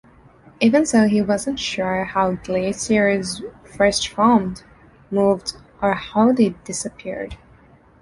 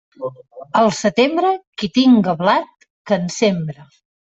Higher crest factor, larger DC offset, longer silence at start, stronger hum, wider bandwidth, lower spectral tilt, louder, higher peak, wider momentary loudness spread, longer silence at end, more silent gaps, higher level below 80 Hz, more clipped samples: about the same, 18 dB vs 14 dB; neither; first, 0.6 s vs 0.2 s; neither; first, 11.5 kHz vs 8 kHz; about the same, -4.5 dB/octave vs -5.5 dB/octave; about the same, -19 LUFS vs -17 LUFS; about the same, -2 dBFS vs -2 dBFS; second, 14 LU vs 17 LU; first, 0.65 s vs 0.4 s; second, none vs 1.67-1.73 s, 2.90-3.05 s; first, -48 dBFS vs -58 dBFS; neither